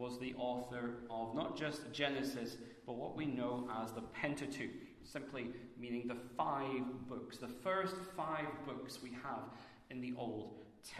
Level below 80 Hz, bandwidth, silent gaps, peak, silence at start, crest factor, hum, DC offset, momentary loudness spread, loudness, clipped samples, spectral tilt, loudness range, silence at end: -72 dBFS; 13.5 kHz; none; -22 dBFS; 0 s; 22 dB; none; under 0.1%; 10 LU; -43 LUFS; under 0.1%; -5 dB/octave; 2 LU; 0 s